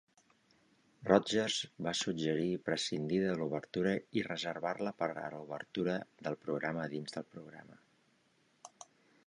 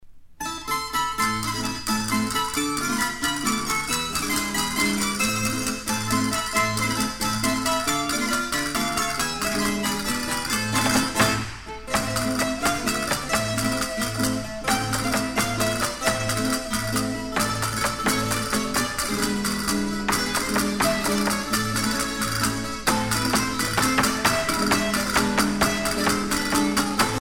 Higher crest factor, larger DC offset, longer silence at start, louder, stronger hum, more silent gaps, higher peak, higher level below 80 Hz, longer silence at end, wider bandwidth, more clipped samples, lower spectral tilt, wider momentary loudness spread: first, 24 dB vs 18 dB; neither; first, 1 s vs 0 s; second, -36 LUFS vs -23 LUFS; neither; neither; second, -12 dBFS vs -6 dBFS; second, -72 dBFS vs -44 dBFS; first, 0.6 s vs 0 s; second, 11 kHz vs over 20 kHz; neither; first, -4.5 dB/octave vs -3 dB/octave; first, 17 LU vs 4 LU